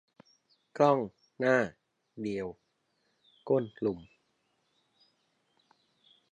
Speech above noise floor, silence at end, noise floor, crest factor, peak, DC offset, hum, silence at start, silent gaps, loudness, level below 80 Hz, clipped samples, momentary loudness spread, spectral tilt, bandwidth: 47 dB; 2.3 s; -76 dBFS; 24 dB; -10 dBFS; under 0.1%; none; 0.75 s; none; -31 LUFS; -72 dBFS; under 0.1%; 17 LU; -7 dB/octave; 9.8 kHz